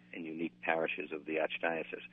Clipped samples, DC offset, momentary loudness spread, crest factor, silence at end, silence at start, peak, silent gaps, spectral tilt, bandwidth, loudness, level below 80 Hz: under 0.1%; under 0.1%; 7 LU; 22 dB; 0.05 s; 0 s; -14 dBFS; none; -7.5 dB/octave; 3.9 kHz; -36 LUFS; -84 dBFS